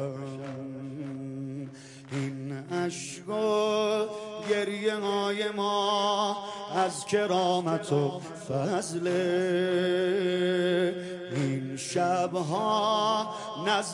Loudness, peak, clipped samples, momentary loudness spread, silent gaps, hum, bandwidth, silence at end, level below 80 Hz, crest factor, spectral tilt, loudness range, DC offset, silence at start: -29 LUFS; -12 dBFS; under 0.1%; 12 LU; none; none; 11.5 kHz; 0 s; -74 dBFS; 16 dB; -5 dB/octave; 3 LU; under 0.1%; 0 s